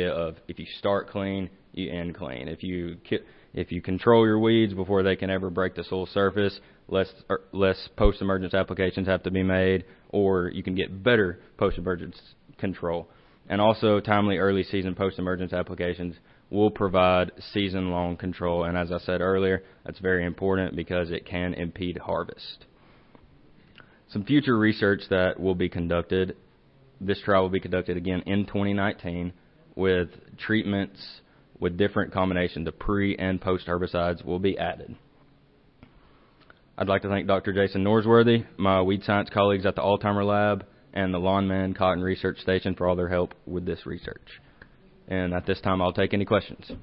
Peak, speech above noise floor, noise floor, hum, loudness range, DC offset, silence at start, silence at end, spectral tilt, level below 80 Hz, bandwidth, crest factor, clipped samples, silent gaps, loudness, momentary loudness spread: -6 dBFS; 33 dB; -59 dBFS; none; 6 LU; under 0.1%; 0 s; 0.05 s; -11 dB/octave; -46 dBFS; 5.6 kHz; 20 dB; under 0.1%; none; -26 LUFS; 12 LU